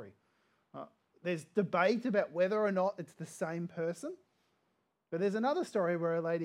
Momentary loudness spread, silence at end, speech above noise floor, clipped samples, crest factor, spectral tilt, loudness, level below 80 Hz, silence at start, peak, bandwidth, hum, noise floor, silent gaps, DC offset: 19 LU; 0 s; 46 dB; under 0.1%; 20 dB; -6.5 dB/octave; -34 LUFS; -90 dBFS; 0 s; -16 dBFS; 13.5 kHz; none; -79 dBFS; none; under 0.1%